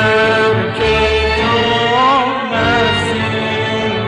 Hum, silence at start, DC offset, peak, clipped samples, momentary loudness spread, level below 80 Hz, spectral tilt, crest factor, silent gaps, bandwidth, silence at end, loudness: none; 0 s; under 0.1%; -2 dBFS; under 0.1%; 5 LU; -30 dBFS; -5 dB/octave; 12 dB; none; 10.5 kHz; 0 s; -13 LUFS